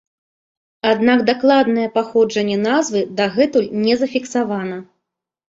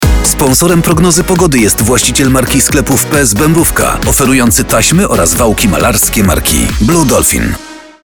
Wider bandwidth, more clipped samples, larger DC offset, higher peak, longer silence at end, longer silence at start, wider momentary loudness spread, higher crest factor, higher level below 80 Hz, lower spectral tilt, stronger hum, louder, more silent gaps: second, 7.8 kHz vs 19.5 kHz; neither; neither; about the same, -2 dBFS vs 0 dBFS; first, 0.75 s vs 0.15 s; first, 0.85 s vs 0 s; first, 8 LU vs 2 LU; first, 16 dB vs 8 dB; second, -60 dBFS vs -20 dBFS; about the same, -5 dB/octave vs -4 dB/octave; neither; second, -17 LUFS vs -8 LUFS; neither